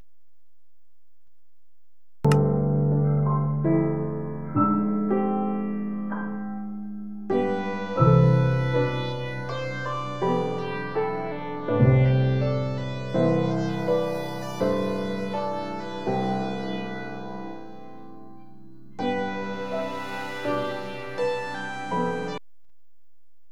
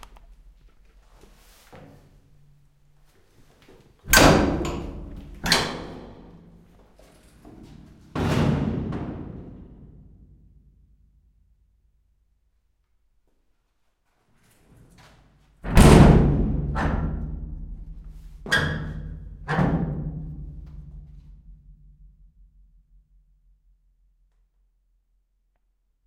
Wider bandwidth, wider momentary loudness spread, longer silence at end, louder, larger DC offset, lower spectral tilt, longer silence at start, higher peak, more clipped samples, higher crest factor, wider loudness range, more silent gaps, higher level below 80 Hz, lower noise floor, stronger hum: second, 11 kHz vs 16.5 kHz; second, 13 LU vs 28 LU; second, 1.15 s vs 4.55 s; second, -26 LUFS vs -21 LUFS; first, 1% vs under 0.1%; first, -8 dB/octave vs -5 dB/octave; first, 2.25 s vs 1.75 s; second, -6 dBFS vs 0 dBFS; neither; second, 20 dB vs 26 dB; second, 8 LU vs 11 LU; neither; second, -50 dBFS vs -32 dBFS; first, -77 dBFS vs -70 dBFS; neither